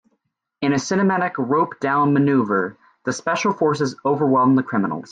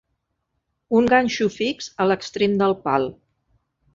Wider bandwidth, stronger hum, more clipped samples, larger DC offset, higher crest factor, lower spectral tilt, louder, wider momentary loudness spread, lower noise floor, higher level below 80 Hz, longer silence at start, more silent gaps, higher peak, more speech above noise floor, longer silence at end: first, 9.2 kHz vs 7.6 kHz; neither; neither; neither; second, 14 dB vs 20 dB; about the same, -6 dB/octave vs -5 dB/octave; about the same, -20 LUFS vs -21 LUFS; about the same, 8 LU vs 8 LU; about the same, -72 dBFS vs -75 dBFS; second, -64 dBFS vs -56 dBFS; second, 0.6 s vs 0.9 s; neither; about the same, -6 dBFS vs -4 dBFS; about the same, 53 dB vs 55 dB; second, 0.05 s vs 0.85 s